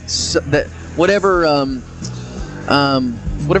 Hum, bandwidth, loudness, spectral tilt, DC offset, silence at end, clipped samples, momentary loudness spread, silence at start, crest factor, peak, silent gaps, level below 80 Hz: none; 10.5 kHz; -16 LUFS; -4.5 dB/octave; under 0.1%; 0 s; under 0.1%; 15 LU; 0 s; 16 dB; 0 dBFS; none; -34 dBFS